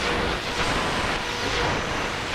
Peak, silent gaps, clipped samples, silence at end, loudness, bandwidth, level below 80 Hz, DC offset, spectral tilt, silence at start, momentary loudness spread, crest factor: -12 dBFS; none; under 0.1%; 0 s; -25 LUFS; 15.5 kHz; -36 dBFS; under 0.1%; -3.5 dB/octave; 0 s; 2 LU; 14 dB